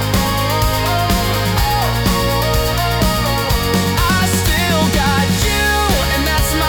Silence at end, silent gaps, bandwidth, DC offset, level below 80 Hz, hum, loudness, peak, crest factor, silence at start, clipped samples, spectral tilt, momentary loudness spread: 0 s; none; over 20 kHz; under 0.1%; -22 dBFS; none; -15 LUFS; -4 dBFS; 10 dB; 0 s; under 0.1%; -4 dB/octave; 2 LU